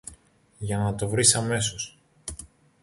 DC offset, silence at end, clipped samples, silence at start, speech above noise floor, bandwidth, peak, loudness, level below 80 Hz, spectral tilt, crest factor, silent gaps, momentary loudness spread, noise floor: under 0.1%; 0.4 s; under 0.1%; 0.05 s; 31 dB; 11.5 kHz; -4 dBFS; -23 LUFS; -50 dBFS; -3 dB/octave; 24 dB; none; 21 LU; -56 dBFS